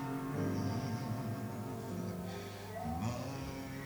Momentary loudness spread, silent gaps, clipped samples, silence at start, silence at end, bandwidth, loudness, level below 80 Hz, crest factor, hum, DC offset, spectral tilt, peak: 6 LU; none; under 0.1%; 0 s; 0 s; over 20 kHz; -40 LUFS; -58 dBFS; 14 dB; 50 Hz at -50 dBFS; under 0.1%; -6.5 dB/octave; -24 dBFS